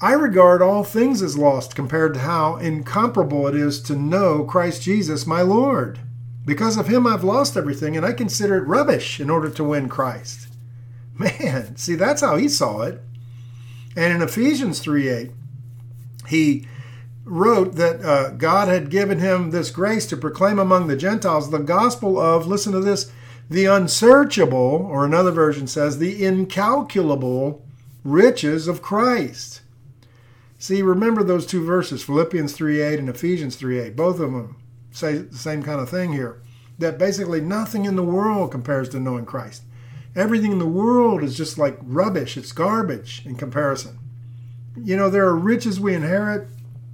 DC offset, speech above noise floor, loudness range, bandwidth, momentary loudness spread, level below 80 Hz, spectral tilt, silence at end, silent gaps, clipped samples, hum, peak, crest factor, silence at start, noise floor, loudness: under 0.1%; 30 dB; 7 LU; 19 kHz; 17 LU; -60 dBFS; -5.5 dB/octave; 0 s; none; under 0.1%; none; 0 dBFS; 20 dB; 0 s; -49 dBFS; -19 LUFS